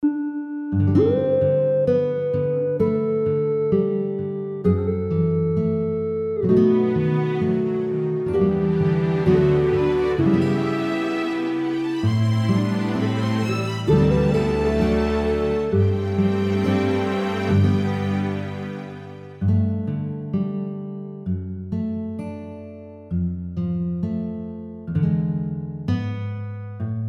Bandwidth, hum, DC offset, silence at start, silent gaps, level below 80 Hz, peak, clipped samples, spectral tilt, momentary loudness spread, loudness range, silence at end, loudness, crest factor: 9.8 kHz; none; under 0.1%; 0 s; none; -42 dBFS; -4 dBFS; under 0.1%; -8.5 dB/octave; 11 LU; 7 LU; 0 s; -22 LUFS; 16 dB